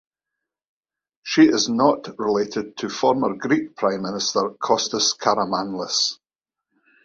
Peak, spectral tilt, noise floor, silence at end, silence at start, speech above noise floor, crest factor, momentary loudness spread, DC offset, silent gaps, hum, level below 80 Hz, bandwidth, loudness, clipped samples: -2 dBFS; -3 dB/octave; -89 dBFS; 0.9 s; 1.25 s; 68 dB; 20 dB; 9 LU; under 0.1%; none; none; -64 dBFS; 7.8 kHz; -21 LUFS; under 0.1%